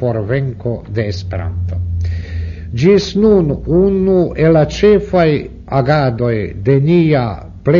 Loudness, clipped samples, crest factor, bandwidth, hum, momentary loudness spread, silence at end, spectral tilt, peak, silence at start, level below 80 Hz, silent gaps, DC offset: -14 LUFS; under 0.1%; 14 dB; 7.2 kHz; none; 10 LU; 0 s; -8 dB/octave; 0 dBFS; 0 s; -30 dBFS; none; under 0.1%